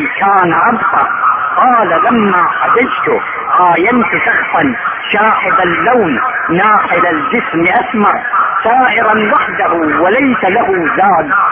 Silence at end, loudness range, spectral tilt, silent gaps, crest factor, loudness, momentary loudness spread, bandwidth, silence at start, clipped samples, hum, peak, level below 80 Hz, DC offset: 0 s; 1 LU; -8.5 dB/octave; none; 10 dB; -10 LUFS; 4 LU; 3.7 kHz; 0 s; under 0.1%; none; 0 dBFS; -46 dBFS; under 0.1%